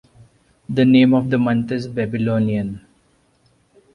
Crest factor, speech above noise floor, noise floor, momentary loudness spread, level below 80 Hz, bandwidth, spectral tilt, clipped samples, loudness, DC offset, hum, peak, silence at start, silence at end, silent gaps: 16 dB; 43 dB; -59 dBFS; 12 LU; -52 dBFS; 6 kHz; -8.5 dB/octave; under 0.1%; -18 LUFS; under 0.1%; none; -2 dBFS; 0.7 s; 1.15 s; none